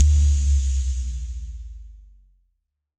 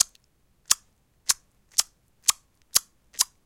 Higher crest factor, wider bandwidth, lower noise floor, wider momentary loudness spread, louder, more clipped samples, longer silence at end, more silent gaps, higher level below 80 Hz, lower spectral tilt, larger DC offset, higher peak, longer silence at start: second, 20 dB vs 30 dB; second, 8.8 kHz vs 17 kHz; first, -74 dBFS vs -65 dBFS; first, 21 LU vs 12 LU; about the same, -23 LUFS vs -25 LUFS; neither; first, 1.05 s vs 0.2 s; neither; first, -22 dBFS vs -64 dBFS; first, -5 dB/octave vs 3 dB/octave; neither; about the same, -2 dBFS vs 0 dBFS; about the same, 0 s vs 0 s